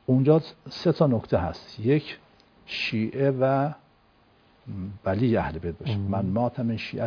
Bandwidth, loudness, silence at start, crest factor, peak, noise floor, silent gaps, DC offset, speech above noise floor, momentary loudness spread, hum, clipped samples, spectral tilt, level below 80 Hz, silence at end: 5.4 kHz; -26 LUFS; 0.1 s; 20 dB; -6 dBFS; -60 dBFS; none; under 0.1%; 36 dB; 15 LU; none; under 0.1%; -8.5 dB/octave; -52 dBFS; 0 s